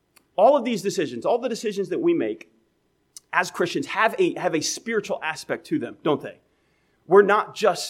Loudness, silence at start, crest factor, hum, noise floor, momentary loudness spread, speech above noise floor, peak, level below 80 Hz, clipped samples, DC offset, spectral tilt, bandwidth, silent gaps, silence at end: -23 LUFS; 0.4 s; 20 dB; none; -68 dBFS; 10 LU; 46 dB; -2 dBFS; -74 dBFS; under 0.1%; under 0.1%; -4 dB/octave; 15.5 kHz; none; 0 s